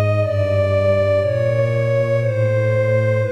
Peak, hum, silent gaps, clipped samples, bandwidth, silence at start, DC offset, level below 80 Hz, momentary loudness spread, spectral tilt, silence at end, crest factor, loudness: -4 dBFS; none; none; under 0.1%; 8.6 kHz; 0 s; 0.7%; -52 dBFS; 2 LU; -8 dB/octave; 0 s; 12 dB; -18 LUFS